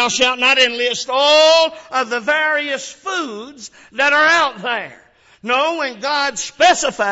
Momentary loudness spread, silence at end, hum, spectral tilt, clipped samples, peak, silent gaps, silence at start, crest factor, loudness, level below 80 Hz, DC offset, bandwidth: 15 LU; 0 s; none; -0.5 dB/octave; under 0.1%; -2 dBFS; none; 0 s; 14 dB; -15 LUFS; -56 dBFS; under 0.1%; 8 kHz